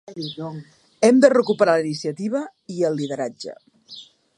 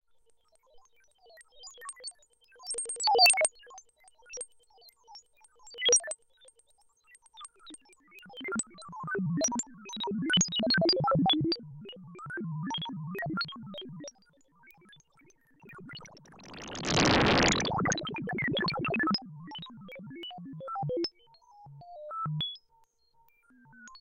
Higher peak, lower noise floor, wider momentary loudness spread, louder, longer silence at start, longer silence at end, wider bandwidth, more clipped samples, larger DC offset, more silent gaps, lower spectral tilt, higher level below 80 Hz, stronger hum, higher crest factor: first, -2 dBFS vs -10 dBFS; second, -44 dBFS vs -67 dBFS; about the same, 24 LU vs 23 LU; first, -20 LUFS vs -28 LUFS; second, 0.1 s vs 0.75 s; first, 0.35 s vs 0 s; second, 11 kHz vs 16.5 kHz; neither; neither; neither; first, -5.5 dB/octave vs -3 dB/octave; second, -72 dBFS vs -56 dBFS; neither; about the same, 20 dB vs 22 dB